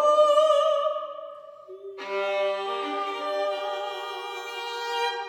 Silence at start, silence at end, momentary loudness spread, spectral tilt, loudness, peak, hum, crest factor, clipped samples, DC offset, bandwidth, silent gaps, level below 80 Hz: 0 s; 0 s; 21 LU; -1 dB/octave; -26 LUFS; -8 dBFS; none; 18 dB; under 0.1%; under 0.1%; 15 kHz; none; -86 dBFS